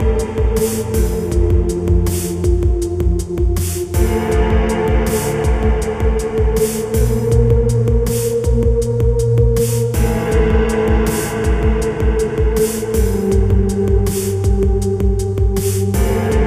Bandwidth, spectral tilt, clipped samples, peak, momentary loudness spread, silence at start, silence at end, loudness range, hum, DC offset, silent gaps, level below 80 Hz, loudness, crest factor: 16 kHz; -6.5 dB/octave; under 0.1%; -2 dBFS; 3 LU; 0 s; 0 s; 2 LU; none; under 0.1%; none; -18 dBFS; -16 LUFS; 12 dB